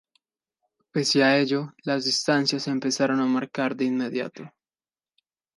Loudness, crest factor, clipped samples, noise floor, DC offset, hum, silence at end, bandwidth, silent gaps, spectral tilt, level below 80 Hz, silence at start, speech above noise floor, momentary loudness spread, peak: -24 LUFS; 18 dB; under 0.1%; under -90 dBFS; under 0.1%; none; 1.1 s; 11.5 kHz; none; -4 dB/octave; -76 dBFS; 0.95 s; over 66 dB; 10 LU; -8 dBFS